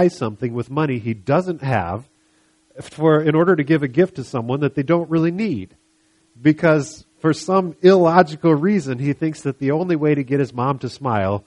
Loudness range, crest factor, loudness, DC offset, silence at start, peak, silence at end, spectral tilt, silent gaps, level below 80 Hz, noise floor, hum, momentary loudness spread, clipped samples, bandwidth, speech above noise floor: 3 LU; 18 dB; -19 LUFS; under 0.1%; 0 s; 0 dBFS; 0.05 s; -7.5 dB/octave; none; -56 dBFS; -60 dBFS; none; 9 LU; under 0.1%; 11 kHz; 42 dB